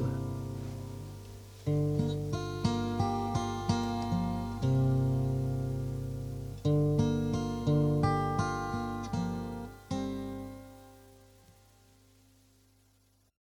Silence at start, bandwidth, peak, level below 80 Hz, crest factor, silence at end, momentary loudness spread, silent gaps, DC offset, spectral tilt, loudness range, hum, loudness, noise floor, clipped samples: 0 s; 19 kHz; -16 dBFS; -48 dBFS; 18 dB; 2.45 s; 13 LU; none; under 0.1%; -7.5 dB/octave; 11 LU; 50 Hz at -40 dBFS; -32 LUFS; -68 dBFS; under 0.1%